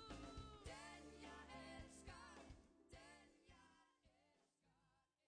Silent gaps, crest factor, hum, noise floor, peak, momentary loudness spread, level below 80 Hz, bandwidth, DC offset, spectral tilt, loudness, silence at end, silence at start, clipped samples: none; 16 dB; none; -84 dBFS; -44 dBFS; 9 LU; -68 dBFS; 11 kHz; under 0.1%; -4 dB/octave; -60 LUFS; 0.25 s; 0 s; under 0.1%